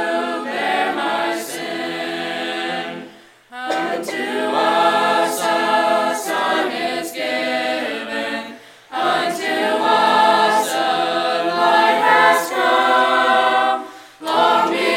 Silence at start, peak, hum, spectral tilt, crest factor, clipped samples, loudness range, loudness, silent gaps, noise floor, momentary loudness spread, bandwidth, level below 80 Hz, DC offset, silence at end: 0 s; -2 dBFS; none; -2.5 dB/octave; 16 dB; under 0.1%; 8 LU; -17 LUFS; none; -43 dBFS; 11 LU; 18 kHz; -74 dBFS; under 0.1%; 0 s